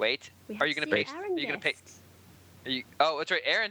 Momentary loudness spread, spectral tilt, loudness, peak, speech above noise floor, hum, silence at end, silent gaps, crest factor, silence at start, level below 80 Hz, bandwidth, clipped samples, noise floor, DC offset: 9 LU; -3.5 dB/octave; -29 LUFS; -10 dBFS; 25 dB; none; 0 s; none; 22 dB; 0 s; -74 dBFS; over 20 kHz; under 0.1%; -55 dBFS; under 0.1%